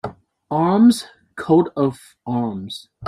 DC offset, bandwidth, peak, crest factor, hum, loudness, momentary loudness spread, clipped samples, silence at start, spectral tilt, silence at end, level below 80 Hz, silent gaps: under 0.1%; 14 kHz; -4 dBFS; 16 dB; none; -18 LUFS; 19 LU; under 0.1%; 0.05 s; -6.5 dB/octave; 0 s; -58 dBFS; none